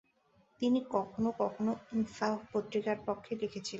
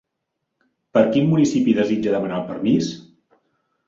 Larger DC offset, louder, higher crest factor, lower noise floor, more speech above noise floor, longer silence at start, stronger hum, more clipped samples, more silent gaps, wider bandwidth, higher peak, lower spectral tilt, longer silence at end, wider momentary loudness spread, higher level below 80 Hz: neither; second, -35 LUFS vs -19 LUFS; about the same, 18 dB vs 18 dB; second, -70 dBFS vs -78 dBFS; second, 36 dB vs 60 dB; second, 0.6 s vs 0.95 s; neither; neither; neither; about the same, 8 kHz vs 7.8 kHz; second, -16 dBFS vs -2 dBFS; second, -5.5 dB/octave vs -7 dB/octave; second, 0 s vs 0.85 s; second, 5 LU vs 8 LU; second, -70 dBFS vs -60 dBFS